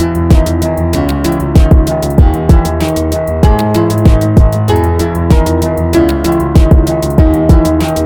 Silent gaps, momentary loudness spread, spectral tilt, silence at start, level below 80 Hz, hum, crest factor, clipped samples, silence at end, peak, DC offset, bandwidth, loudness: none; 5 LU; -7.5 dB/octave; 0 s; -12 dBFS; none; 8 dB; 2%; 0 s; 0 dBFS; under 0.1%; 19.5 kHz; -10 LUFS